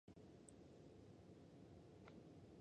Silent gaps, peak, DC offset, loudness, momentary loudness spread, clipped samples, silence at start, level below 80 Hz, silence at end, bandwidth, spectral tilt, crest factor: none; -44 dBFS; under 0.1%; -64 LUFS; 1 LU; under 0.1%; 0.05 s; -78 dBFS; 0 s; 9.4 kHz; -6 dB/octave; 20 dB